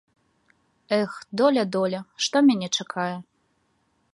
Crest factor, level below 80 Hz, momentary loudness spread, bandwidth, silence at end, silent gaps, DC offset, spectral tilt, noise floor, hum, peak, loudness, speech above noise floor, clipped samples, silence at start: 18 dB; -74 dBFS; 10 LU; 11.5 kHz; 0.9 s; none; under 0.1%; -4 dB/octave; -69 dBFS; none; -8 dBFS; -24 LUFS; 46 dB; under 0.1%; 0.9 s